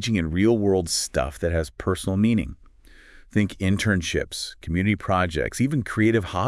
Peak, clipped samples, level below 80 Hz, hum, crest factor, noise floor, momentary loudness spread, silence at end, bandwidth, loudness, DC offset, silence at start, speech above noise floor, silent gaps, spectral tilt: -8 dBFS; under 0.1%; -42 dBFS; none; 16 dB; -50 dBFS; 6 LU; 0 s; 12 kHz; -23 LUFS; under 0.1%; 0 s; 27 dB; none; -5.5 dB/octave